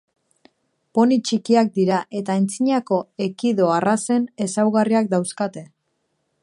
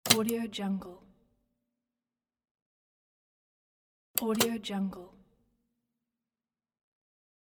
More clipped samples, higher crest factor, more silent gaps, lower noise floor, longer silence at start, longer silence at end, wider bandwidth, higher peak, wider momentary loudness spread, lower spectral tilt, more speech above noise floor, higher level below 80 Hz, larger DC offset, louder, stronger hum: neither; second, 16 dB vs 32 dB; second, none vs 2.51-2.55 s, 2.62-4.14 s; second, -72 dBFS vs under -90 dBFS; first, 0.95 s vs 0.05 s; second, 0.75 s vs 2.4 s; second, 11.5 kHz vs 17.5 kHz; about the same, -4 dBFS vs -4 dBFS; second, 8 LU vs 13 LU; first, -5.5 dB/octave vs -3 dB/octave; second, 52 dB vs over 57 dB; about the same, -70 dBFS vs -70 dBFS; neither; first, -20 LUFS vs -31 LUFS; neither